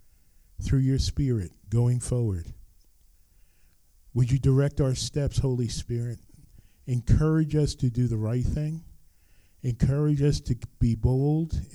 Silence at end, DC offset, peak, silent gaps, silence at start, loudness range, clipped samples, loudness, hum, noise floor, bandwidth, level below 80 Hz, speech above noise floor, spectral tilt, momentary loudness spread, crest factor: 0 s; under 0.1%; -8 dBFS; none; 0.6 s; 2 LU; under 0.1%; -26 LUFS; none; -59 dBFS; 12 kHz; -38 dBFS; 34 dB; -7 dB/octave; 10 LU; 18 dB